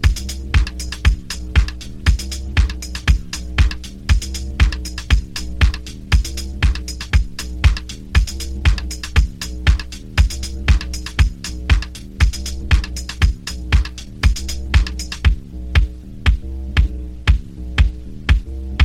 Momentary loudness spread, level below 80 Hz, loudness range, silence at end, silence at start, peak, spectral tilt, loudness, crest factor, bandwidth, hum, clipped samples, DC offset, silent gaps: 7 LU; -18 dBFS; 0 LU; 0 s; 0 s; 0 dBFS; -4.5 dB/octave; -20 LUFS; 16 dB; 13.5 kHz; none; under 0.1%; under 0.1%; none